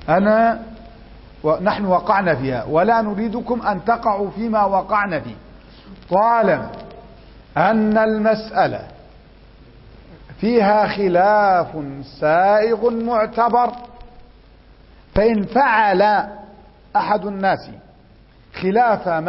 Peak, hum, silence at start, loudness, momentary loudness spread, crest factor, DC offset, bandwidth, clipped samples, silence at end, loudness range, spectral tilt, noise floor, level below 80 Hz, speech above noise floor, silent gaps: -2 dBFS; none; 0 s; -18 LUFS; 11 LU; 16 dB; under 0.1%; 5.8 kHz; under 0.1%; 0 s; 3 LU; -10.5 dB/octave; -48 dBFS; -44 dBFS; 31 dB; none